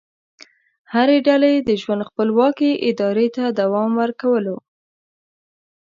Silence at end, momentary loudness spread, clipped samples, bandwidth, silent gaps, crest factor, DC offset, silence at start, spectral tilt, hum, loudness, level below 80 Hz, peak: 1.35 s; 7 LU; under 0.1%; 7.4 kHz; none; 16 dB; under 0.1%; 0.9 s; -7 dB/octave; none; -18 LUFS; -64 dBFS; -2 dBFS